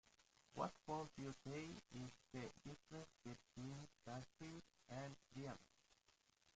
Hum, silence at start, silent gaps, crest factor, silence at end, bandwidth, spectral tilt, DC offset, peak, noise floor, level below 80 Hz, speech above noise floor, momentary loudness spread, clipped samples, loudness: none; 0.05 s; none; 24 dB; 0.05 s; 9 kHz; -5.5 dB/octave; under 0.1%; -32 dBFS; -80 dBFS; -78 dBFS; 25 dB; 9 LU; under 0.1%; -55 LUFS